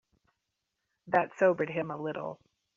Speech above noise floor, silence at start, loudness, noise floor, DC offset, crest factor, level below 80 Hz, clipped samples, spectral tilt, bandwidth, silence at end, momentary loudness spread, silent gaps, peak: 54 dB; 1.05 s; -30 LUFS; -84 dBFS; under 0.1%; 22 dB; -78 dBFS; under 0.1%; -5.5 dB/octave; 7.4 kHz; 0.4 s; 12 LU; none; -12 dBFS